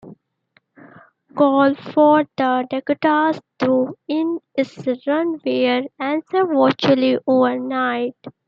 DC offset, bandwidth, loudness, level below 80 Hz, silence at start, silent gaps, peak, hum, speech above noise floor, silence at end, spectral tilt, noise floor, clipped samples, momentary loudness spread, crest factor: under 0.1%; 7 kHz; -19 LUFS; -70 dBFS; 0.05 s; none; -2 dBFS; none; 44 dB; 0.15 s; -7 dB/octave; -62 dBFS; under 0.1%; 8 LU; 16 dB